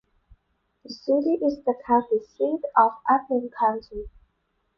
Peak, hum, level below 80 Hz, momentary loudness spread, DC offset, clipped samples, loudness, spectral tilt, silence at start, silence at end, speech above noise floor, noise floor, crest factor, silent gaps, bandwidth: -4 dBFS; none; -54 dBFS; 16 LU; under 0.1%; under 0.1%; -24 LUFS; -6.5 dB/octave; 0.9 s; 0.7 s; 49 dB; -73 dBFS; 20 dB; none; 6.4 kHz